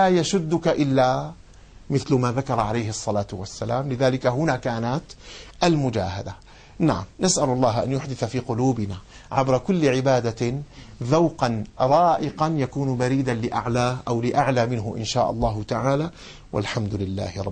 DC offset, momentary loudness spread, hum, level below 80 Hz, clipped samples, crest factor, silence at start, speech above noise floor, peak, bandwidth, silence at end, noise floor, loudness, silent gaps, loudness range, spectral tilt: under 0.1%; 10 LU; none; -46 dBFS; under 0.1%; 16 dB; 0 s; 23 dB; -6 dBFS; 9.8 kHz; 0 s; -46 dBFS; -23 LUFS; none; 3 LU; -6 dB/octave